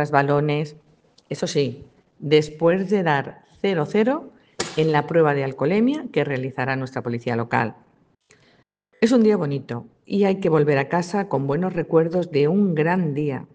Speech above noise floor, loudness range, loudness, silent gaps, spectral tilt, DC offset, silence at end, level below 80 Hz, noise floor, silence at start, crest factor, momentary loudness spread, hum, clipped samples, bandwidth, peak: 40 dB; 3 LU; -21 LUFS; none; -6.5 dB/octave; under 0.1%; 0.15 s; -62 dBFS; -61 dBFS; 0 s; 20 dB; 9 LU; none; under 0.1%; 9.6 kHz; 0 dBFS